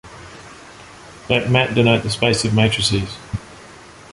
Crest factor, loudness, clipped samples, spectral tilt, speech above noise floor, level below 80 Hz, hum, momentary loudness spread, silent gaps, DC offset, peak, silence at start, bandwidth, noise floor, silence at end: 20 dB; -17 LUFS; under 0.1%; -5 dB/octave; 24 dB; -42 dBFS; none; 24 LU; none; under 0.1%; 0 dBFS; 0.05 s; 11.5 kHz; -41 dBFS; 0.2 s